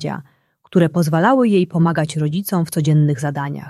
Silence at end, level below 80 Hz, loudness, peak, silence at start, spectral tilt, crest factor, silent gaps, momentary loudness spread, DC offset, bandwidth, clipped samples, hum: 0 s; -58 dBFS; -17 LUFS; -2 dBFS; 0 s; -7 dB/octave; 16 dB; none; 7 LU; under 0.1%; 13.5 kHz; under 0.1%; none